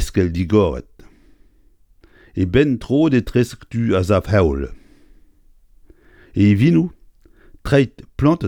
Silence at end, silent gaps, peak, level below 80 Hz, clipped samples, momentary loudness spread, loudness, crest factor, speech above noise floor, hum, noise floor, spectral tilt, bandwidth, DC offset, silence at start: 0 s; none; 0 dBFS; -36 dBFS; under 0.1%; 12 LU; -18 LUFS; 18 dB; 37 dB; none; -53 dBFS; -7.5 dB/octave; 17 kHz; under 0.1%; 0 s